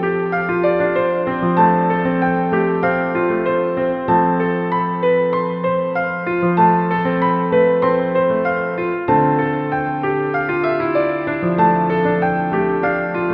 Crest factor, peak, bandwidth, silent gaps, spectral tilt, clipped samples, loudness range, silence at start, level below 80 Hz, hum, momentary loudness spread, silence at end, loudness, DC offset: 14 dB; -2 dBFS; 5.4 kHz; none; -10.5 dB/octave; under 0.1%; 1 LU; 0 s; -50 dBFS; none; 5 LU; 0 s; -17 LUFS; under 0.1%